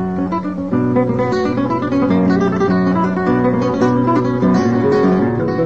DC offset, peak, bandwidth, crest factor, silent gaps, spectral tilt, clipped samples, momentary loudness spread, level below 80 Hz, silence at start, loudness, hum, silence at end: 0.7%; -4 dBFS; 7.6 kHz; 12 dB; none; -8.5 dB/octave; under 0.1%; 4 LU; -44 dBFS; 0 s; -15 LUFS; none; 0 s